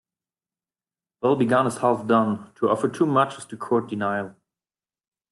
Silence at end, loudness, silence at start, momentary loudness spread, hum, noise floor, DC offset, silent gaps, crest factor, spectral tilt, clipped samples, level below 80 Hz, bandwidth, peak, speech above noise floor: 1 s; -23 LUFS; 1.2 s; 7 LU; none; under -90 dBFS; under 0.1%; none; 18 dB; -6.5 dB/octave; under 0.1%; -68 dBFS; 12.5 kHz; -6 dBFS; over 68 dB